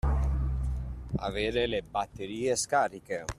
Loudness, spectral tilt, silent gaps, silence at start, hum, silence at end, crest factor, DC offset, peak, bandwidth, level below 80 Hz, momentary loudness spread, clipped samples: -31 LUFS; -4.5 dB/octave; none; 0.05 s; none; 0.05 s; 18 dB; under 0.1%; -12 dBFS; 13.5 kHz; -34 dBFS; 9 LU; under 0.1%